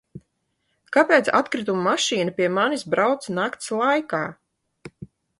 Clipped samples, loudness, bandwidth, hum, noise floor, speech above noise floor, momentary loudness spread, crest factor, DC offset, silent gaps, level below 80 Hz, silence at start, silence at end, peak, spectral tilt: under 0.1%; -21 LUFS; 11.5 kHz; none; -73 dBFS; 51 dB; 10 LU; 20 dB; under 0.1%; none; -66 dBFS; 0.15 s; 0.35 s; -2 dBFS; -4 dB/octave